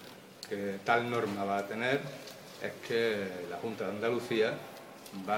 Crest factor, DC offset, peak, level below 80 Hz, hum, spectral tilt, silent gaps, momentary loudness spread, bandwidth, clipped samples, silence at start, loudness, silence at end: 20 dB; under 0.1%; -14 dBFS; -78 dBFS; none; -5 dB/octave; none; 16 LU; 17.5 kHz; under 0.1%; 0 s; -34 LUFS; 0 s